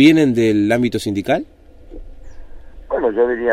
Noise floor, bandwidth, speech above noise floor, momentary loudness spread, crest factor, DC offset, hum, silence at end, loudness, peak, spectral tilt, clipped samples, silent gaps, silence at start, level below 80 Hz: -36 dBFS; 14.5 kHz; 21 dB; 8 LU; 16 dB; under 0.1%; none; 0 s; -17 LUFS; -2 dBFS; -6 dB/octave; under 0.1%; none; 0 s; -40 dBFS